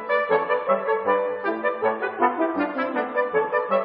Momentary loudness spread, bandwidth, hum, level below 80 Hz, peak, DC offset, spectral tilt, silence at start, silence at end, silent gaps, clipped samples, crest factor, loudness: 3 LU; 5.4 kHz; none; -72 dBFS; -4 dBFS; under 0.1%; -3 dB/octave; 0 s; 0 s; none; under 0.1%; 18 dB; -23 LUFS